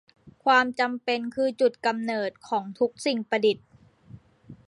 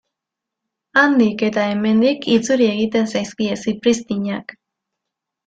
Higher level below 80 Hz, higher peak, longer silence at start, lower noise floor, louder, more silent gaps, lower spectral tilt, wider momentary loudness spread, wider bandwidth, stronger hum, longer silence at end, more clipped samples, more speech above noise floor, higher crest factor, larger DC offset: second, -68 dBFS vs -60 dBFS; second, -8 dBFS vs -2 dBFS; second, 0.25 s vs 0.95 s; second, -50 dBFS vs -83 dBFS; second, -26 LUFS vs -17 LUFS; neither; about the same, -4 dB/octave vs -5 dB/octave; about the same, 9 LU vs 9 LU; first, 11.5 kHz vs 9.2 kHz; neither; second, 0.15 s vs 0.95 s; neither; second, 25 dB vs 66 dB; about the same, 18 dB vs 18 dB; neither